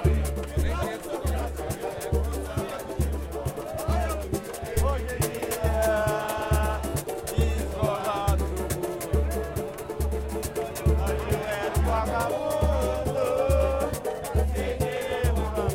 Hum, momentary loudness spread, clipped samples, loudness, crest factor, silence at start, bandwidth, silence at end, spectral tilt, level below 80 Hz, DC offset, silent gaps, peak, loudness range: none; 7 LU; under 0.1%; -28 LUFS; 16 dB; 0 s; 16.5 kHz; 0 s; -5.5 dB/octave; -30 dBFS; under 0.1%; none; -10 dBFS; 4 LU